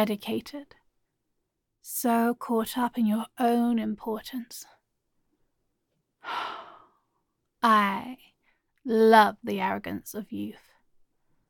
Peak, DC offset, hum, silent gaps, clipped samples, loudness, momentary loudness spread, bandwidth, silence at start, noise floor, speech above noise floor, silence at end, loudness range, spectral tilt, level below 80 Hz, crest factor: -6 dBFS; under 0.1%; none; none; under 0.1%; -26 LUFS; 20 LU; 17.5 kHz; 0 s; -80 dBFS; 54 dB; 0.95 s; 12 LU; -4.5 dB/octave; -68 dBFS; 24 dB